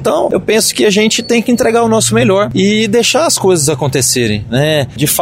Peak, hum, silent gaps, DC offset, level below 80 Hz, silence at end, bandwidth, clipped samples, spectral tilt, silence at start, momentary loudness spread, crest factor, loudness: 0 dBFS; none; none; under 0.1%; -42 dBFS; 0 s; 16.5 kHz; under 0.1%; -4 dB/octave; 0 s; 3 LU; 10 dB; -11 LUFS